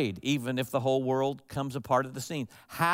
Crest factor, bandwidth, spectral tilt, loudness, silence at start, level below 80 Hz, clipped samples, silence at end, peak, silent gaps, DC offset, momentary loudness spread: 18 dB; 16 kHz; -5.5 dB/octave; -31 LUFS; 0 s; -66 dBFS; under 0.1%; 0 s; -12 dBFS; none; under 0.1%; 8 LU